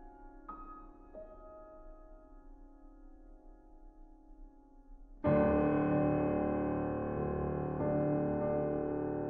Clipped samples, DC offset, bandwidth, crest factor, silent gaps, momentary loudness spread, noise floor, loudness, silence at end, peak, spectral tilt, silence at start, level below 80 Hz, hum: under 0.1%; under 0.1%; 3.5 kHz; 16 dB; none; 23 LU; -56 dBFS; -33 LUFS; 0 s; -20 dBFS; -9.5 dB/octave; 0 s; -52 dBFS; none